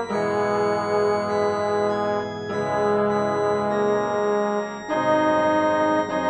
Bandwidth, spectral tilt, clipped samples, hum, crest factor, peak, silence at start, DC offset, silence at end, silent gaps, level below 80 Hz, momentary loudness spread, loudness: 9.4 kHz; -6 dB/octave; under 0.1%; none; 14 dB; -8 dBFS; 0 s; under 0.1%; 0 s; none; -58 dBFS; 6 LU; -22 LUFS